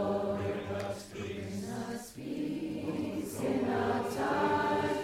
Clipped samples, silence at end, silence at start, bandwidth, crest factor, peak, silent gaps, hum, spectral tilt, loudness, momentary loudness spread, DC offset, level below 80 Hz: under 0.1%; 0 s; 0 s; 16 kHz; 16 dB; -18 dBFS; none; none; -6 dB/octave; -34 LUFS; 10 LU; under 0.1%; -62 dBFS